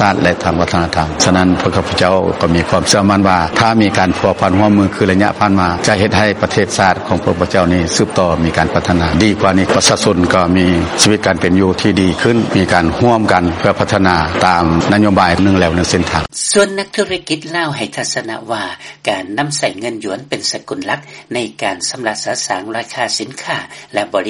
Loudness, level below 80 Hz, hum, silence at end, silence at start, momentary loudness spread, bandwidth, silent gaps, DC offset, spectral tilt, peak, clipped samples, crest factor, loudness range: -13 LUFS; -36 dBFS; none; 0 s; 0 s; 9 LU; 11.5 kHz; none; under 0.1%; -4.5 dB/octave; 0 dBFS; under 0.1%; 12 dB; 7 LU